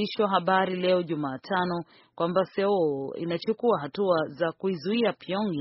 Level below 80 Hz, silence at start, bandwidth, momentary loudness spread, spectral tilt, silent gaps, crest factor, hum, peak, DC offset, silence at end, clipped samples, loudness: -70 dBFS; 0 s; 5.8 kHz; 7 LU; -4.5 dB/octave; none; 18 dB; none; -10 dBFS; under 0.1%; 0 s; under 0.1%; -27 LUFS